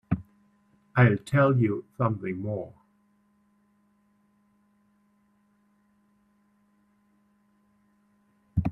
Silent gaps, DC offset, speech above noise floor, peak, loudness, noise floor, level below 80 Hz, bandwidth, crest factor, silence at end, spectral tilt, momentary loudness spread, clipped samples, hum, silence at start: none; under 0.1%; 43 dB; -6 dBFS; -26 LUFS; -67 dBFS; -54 dBFS; 10.5 kHz; 24 dB; 0 s; -9 dB/octave; 12 LU; under 0.1%; none; 0.1 s